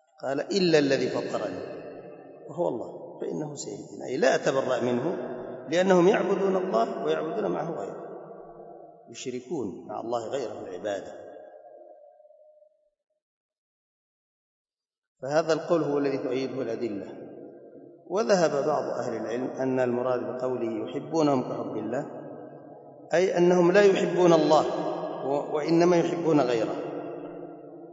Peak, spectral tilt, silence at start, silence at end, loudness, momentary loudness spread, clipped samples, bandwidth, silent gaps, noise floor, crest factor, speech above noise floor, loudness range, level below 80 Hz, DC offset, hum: -6 dBFS; -6 dB/octave; 0.2 s; 0 s; -26 LUFS; 21 LU; under 0.1%; 8 kHz; 13.22-13.49 s, 13.58-14.65 s, 14.98-15.02 s, 15.08-15.15 s; -62 dBFS; 22 dB; 37 dB; 12 LU; -76 dBFS; under 0.1%; none